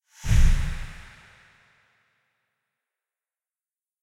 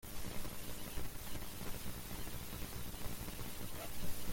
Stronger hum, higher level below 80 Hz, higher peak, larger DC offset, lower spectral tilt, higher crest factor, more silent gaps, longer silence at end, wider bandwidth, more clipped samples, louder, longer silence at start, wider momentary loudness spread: second, none vs 60 Hz at -55 dBFS; first, -28 dBFS vs -50 dBFS; first, -8 dBFS vs -24 dBFS; neither; first, -5 dB/octave vs -3.5 dB/octave; about the same, 20 dB vs 16 dB; neither; first, 3.1 s vs 0 s; second, 12 kHz vs 17 kHz; neither; first, -26 LUFS vs -46 LUFS; first, 0.25 s vs 0.05 s; first, 23 LU vs 1 LU